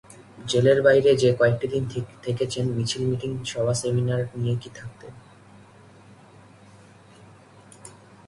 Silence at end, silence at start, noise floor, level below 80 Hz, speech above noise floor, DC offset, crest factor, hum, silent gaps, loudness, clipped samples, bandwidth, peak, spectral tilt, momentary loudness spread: 0.35 s; 0.1 s; -50 dBFS; -56 dBFS; 27 dB; under 0.1%; 20 dB; none; none; -23 LUFS; under 0.1%; 11.5 kHz; -4 dBFS; -5.5 dB/octave; 24 LU